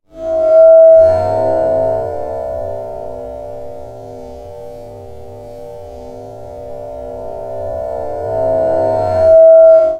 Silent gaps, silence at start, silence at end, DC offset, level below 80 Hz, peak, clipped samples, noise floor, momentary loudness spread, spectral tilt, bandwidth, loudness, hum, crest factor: none; 0.15 s; 0 s; 0.8%; -40 dBFS; 0 dBFS; under 0.1%; -31 dBFS; 26 LU; -8 dB/octave; 4.6 kHz; -11 LUFS; none; 12 dB